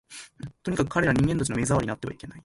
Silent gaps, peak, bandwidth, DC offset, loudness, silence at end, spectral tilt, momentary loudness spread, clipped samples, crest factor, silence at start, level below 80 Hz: none; -8 dBFS; 11.5 kHz; under 0.1%; -26 LUFS; 0.05 s; -6 dB/octave; 17 LU; under 0.1%; 18 dB; 0.1 s; -46 dBFS